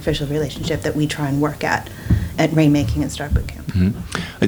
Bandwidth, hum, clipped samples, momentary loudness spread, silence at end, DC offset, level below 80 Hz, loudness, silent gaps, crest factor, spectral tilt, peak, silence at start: over 20 kHz; none; under 0.1%; 7 LU; 0 s; under 0.1%; -30 dBFS; -20 LUFS; none; 18 dB; -6 dB/octave; -2 dBFS; 0 s